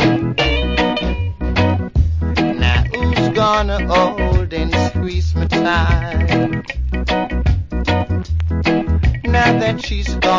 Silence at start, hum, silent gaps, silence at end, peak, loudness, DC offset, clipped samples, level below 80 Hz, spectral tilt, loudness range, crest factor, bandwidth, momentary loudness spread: 0 s; none; none; 0 s; -2 dBFS; -17 LUFS; under 0.1%; under 0.1%; -20 dBFS; -6.5 dB/octave; 2 LU; 14 dB; 7.6 kHz; 5 LU